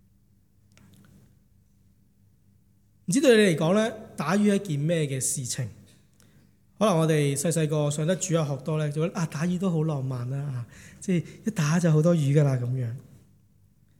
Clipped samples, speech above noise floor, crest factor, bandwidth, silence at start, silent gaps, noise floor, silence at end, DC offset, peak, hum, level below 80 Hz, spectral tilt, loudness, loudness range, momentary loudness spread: under 0.1%; 38 dB; 18 dB; 16 kHz; 3.1 s; none; -63 dBFS; 1 s; under 0.1%; -8 dBFS; none; -66 dBFS; -5.5 dB/octave; -25 LUFS; 4 LU; 11 LU